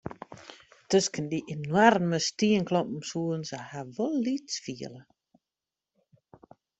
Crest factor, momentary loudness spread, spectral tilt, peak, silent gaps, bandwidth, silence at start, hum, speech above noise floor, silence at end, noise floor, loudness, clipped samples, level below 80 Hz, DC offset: 24 dB; 21 LU; -4.5 dB/octave; -6 dBFS; none; 8.2 kHz; 0.05 s; none; over 62 dB; 1.8 s; under -90 dBFS; -28 LUFS; under 0.1%; -68 dBFS; under 0.1%